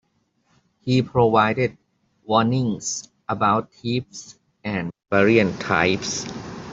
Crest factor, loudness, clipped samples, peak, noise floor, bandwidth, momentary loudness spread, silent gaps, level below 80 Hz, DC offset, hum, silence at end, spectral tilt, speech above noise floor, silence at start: 20 dB; -21 LUFS; under 0.1%; -2 dBFS; -67 dBFS; 8 kHz; 14 LU; none; -54 dBFS; under 0.1%; none; 0 s; -5 dB/octave; 47 dB; 0.85 s